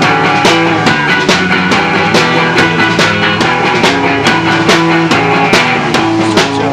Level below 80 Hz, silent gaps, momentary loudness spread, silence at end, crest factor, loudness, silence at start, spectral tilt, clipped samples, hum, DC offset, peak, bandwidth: -40 dBFS; none; 2 LU; 0 s; 10 dB; -8 LUFS; 0 s; -4.5 dB/octave; 0.4%; none; under 0.1%; 0 dBFS; 15.5 kHz